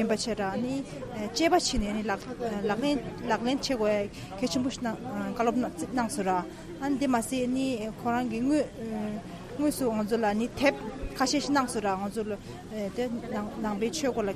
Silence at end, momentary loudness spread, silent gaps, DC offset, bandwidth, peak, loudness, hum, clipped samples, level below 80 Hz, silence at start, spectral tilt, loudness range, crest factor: 0 s; 8 LU; none; under 0.1%; 15 kHz; -10 dBFS; -30 LUFS; none; under 0.1%; -48 dBFS; 0 s; -4.5 dB/octave; 2 LU; 20 dB